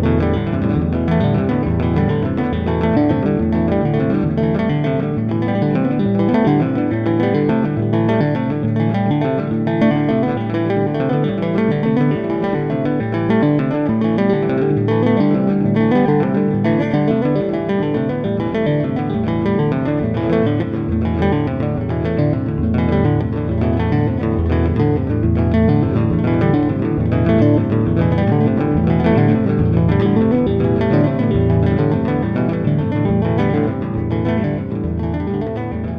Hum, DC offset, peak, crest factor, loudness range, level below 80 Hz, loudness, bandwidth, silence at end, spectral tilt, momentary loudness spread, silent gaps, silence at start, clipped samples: none; under 0.1%; -2 dBFS; 14 dB; 3 LU; -34 dBFS; -17 LUFS; 5.4 kHz; 0 s; -10.5 dB/octave; 4 LU; none; 0 s; under 0.1%